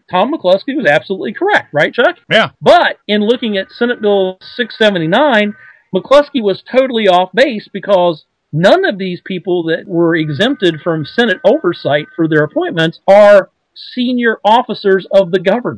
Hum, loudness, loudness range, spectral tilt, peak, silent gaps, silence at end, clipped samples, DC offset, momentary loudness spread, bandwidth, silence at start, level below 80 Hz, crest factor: none; -12 LUFS; 3 LU; -6 dB/octave; 0 dBFS; none; 0 s; 0.9%; under 0.1%; 9 LU; 11 kHz; 0.1 s; -54 dBFS; 12 dB